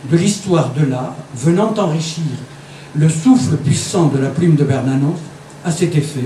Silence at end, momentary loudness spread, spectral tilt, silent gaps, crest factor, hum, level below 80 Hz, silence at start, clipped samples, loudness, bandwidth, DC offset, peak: 0 s; 13 LU; -6.5 dB/octave; none; 14 dB; none; -52 dBFS; 0 s; under 0.1%; -16 LUFS; 12.5 kHz; under 0.1%; 0 dBFS